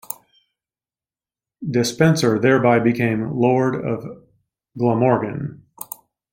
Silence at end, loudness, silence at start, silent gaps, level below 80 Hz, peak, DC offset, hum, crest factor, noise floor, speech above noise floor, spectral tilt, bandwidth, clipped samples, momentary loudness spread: 0.5 s; -19 LUFS; 0.1 s; none; -58 dBFS; -2 dBFS; under 0.1%; none; 18 dB; under -90 dBFS; over 72 dB; -6 dB/octave; 16.5 kHz; under 0.1%; 18 LU